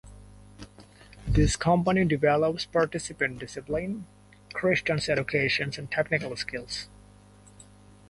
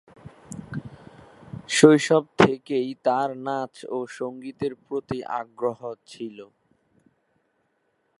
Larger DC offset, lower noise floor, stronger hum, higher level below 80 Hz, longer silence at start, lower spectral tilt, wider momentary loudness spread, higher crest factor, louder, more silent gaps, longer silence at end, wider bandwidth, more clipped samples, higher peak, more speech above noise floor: neither; second, -53 dBFS vs -71 dBFS; first, 50 Hz at -50 dBFS vs none; first, -42 dBFS vs -62 dBFS; second, 0.05 s vs 0.25 s; about the same, -5 dB/octave vs -5 dB/octave; second, 16 LU vs 21 LU; second, 18 dB vs 24 dB; second, -27 LUFS vs -23 LUFS; neither; second, 1.25 s vs 1.75 s; about the same, 11.5 kHz vs 11.5 kHz; neither; second, -10 dBFS vs 0 dBFS; second, 27 dB vs 48 dB